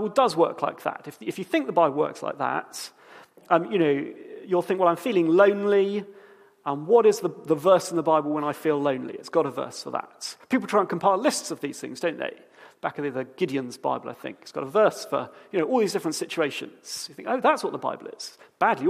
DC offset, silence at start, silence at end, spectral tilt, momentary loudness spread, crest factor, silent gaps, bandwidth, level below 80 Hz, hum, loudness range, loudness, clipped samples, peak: under 0.1%; 0 s; 0 s; -5 dB/octave; 14 LU; 20 dB; none; 15.5 kHz; -78 dBFS; none; 5 LU; -25 LUFS; under 0.1%; -4 dBFS